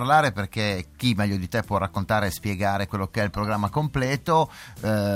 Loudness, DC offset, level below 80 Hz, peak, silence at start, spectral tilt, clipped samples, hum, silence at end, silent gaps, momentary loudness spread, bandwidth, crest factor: -25 LUFS; under 0.1%; -48 dBFS; -6 dBFS; 0 s; -6 dB/octave; under 0.1%; none; 0 s; none; 5 LU; 16.5 kHz; 18 dB